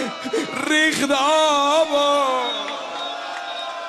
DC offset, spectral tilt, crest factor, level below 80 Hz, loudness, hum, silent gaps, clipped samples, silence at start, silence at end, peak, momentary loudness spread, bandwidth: under 0.1%; -1.5 dB/octave; 12 dB; -66 dBFS; -20 LUFS; none; none; under 0.1%; 0 s; 0 s; -8 dBFS; 11 LU; 13 kHz